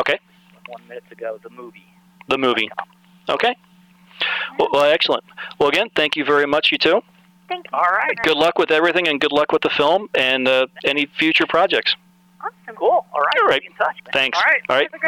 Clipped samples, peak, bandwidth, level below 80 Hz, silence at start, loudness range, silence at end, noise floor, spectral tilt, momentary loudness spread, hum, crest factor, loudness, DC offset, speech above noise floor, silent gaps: under 0.1%; -6 dBFS; 16.5 kHz; -58 dBFS; 0 s; 7 LU; 0 s; -50 dBFS; -4 dB/octave; 16 LU; none; 14 dB; -17 LUFS; under 0.1%; 32 dB; none